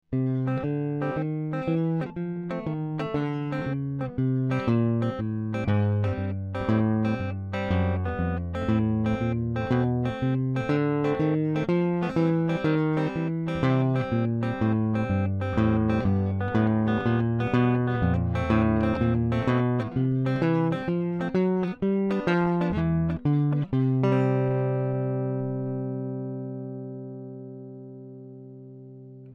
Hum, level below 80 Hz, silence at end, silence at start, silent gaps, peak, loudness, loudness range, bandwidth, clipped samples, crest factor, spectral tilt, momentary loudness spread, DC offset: none; -46 dBFS; 0 s; 0.1 s; none; -10 dBFS; -26 LUFS; 5 LU; 7 kHz; under 0.1%; 16 dB; -9.5 dB/octave; 9 LU; under 0.1%